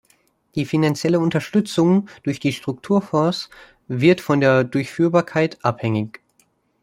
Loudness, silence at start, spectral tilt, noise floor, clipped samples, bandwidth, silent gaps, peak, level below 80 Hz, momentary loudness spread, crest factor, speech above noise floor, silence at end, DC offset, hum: -20 LUFS; 0.55 s; -6.5 dB/octave; -63 dBFS; under 0.1%; 16 kHz; none; -2 dBFS; -60 dBFS; 11 LU; 18 dB; 44 dB; 0.75 s; under 0.1%; none